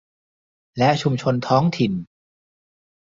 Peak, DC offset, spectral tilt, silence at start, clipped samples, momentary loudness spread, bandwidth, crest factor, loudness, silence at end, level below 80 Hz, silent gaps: -2 dBFS; under 0.1%; -7 dB/octave; 0.75 s; under 0.1%; 9 LU; 7.6 kHz; 20 dB; -20 LUFS; 1.05 s; -58 dBFS; none